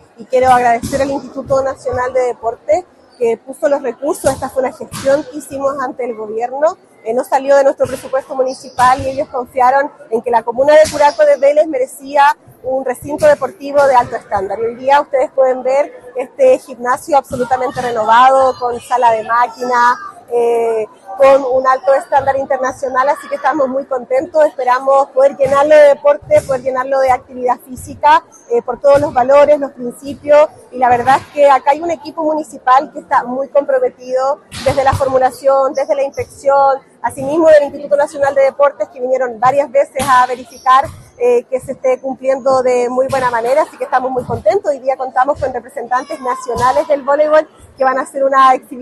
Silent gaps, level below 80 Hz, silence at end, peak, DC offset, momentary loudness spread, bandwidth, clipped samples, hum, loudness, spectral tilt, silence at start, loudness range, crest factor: none; -46 dBFS; 0 s; 0 dBFS; under 0.1%; 10 LU; 12.5 kHz; under 0.1%; none; -13 LUFS; -4.5 dB/octave; 0.2 s; 4 LU; 14 dB